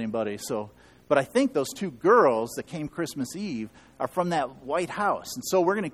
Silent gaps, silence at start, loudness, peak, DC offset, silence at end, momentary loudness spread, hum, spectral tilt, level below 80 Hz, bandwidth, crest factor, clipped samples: none; 0 s; -27 LUFS; -6 dBFS; under 0.1%; 0 s; 13 LU; none; -5 dB/octave; -62 dBFS; 15.5 kHz; 20 dB; under 0.1%